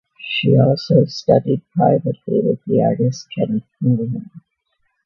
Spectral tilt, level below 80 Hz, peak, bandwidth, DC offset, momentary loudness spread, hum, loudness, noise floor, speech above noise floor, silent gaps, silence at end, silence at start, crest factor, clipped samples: -7.5 dB/octave; -58 dBFS; 0 dBFS; 7 kHz; under 0.1%; 8 LU; none; -17 LUFS; -68 dBFS; 52 dB; none; 0.65 s; 0.2 s; 18 dB; under 0.1%